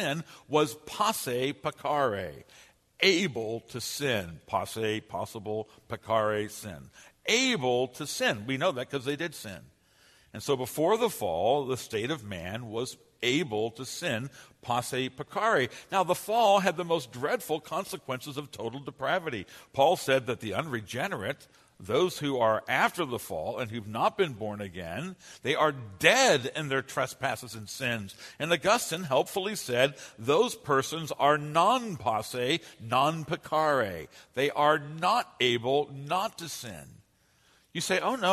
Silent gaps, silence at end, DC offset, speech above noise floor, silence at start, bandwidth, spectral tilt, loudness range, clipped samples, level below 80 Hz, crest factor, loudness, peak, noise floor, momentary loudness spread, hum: none; 0 s; under 0.1%; 37 dB; 0 s; 13.5 kHz; -3.5 dB/octave; 4 LU; under 0.1%; -66 dBFS; 26 dB; -29 LUFS; -4 dBFS; -66 dBFS; 13 LU; none